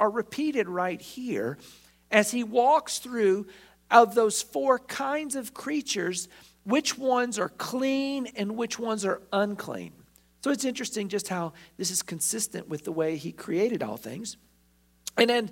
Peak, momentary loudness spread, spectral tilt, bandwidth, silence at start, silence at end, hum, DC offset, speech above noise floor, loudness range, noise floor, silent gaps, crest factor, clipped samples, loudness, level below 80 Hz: -4 dBFS; 13 LU; -3.5 dB/octave; 16.5 kHz; 0 s; 0 s; 60 Hz at -65 dBFS; under 0.1%; 37 dB; 6 LU; -64 dBFS; none; 24 dB; under 0.1%; -27 LUFS; -68 dBFS